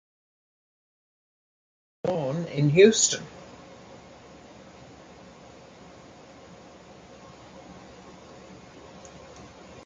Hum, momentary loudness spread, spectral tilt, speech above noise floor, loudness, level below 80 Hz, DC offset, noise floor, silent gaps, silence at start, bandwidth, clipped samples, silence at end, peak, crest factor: none; 27 LU; -4 dB/octave; 27 dB; -22 LUFS; -62 dBFS; under 0.1%; -49 dBFS; none; 2.05 s; 9.6 kHz; under 0.1%; 0.45 s; -4 dBFS; 26 dB